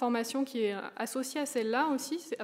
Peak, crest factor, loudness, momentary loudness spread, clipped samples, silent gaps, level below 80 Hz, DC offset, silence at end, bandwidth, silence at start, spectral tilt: -16 dBFS; 16 dB; -33 LUFS; 6 LU; under 0.1%; none; under -90 dBFS; under 0.1%; 0 s; 16 kHz; 0 s; -3 dB/octave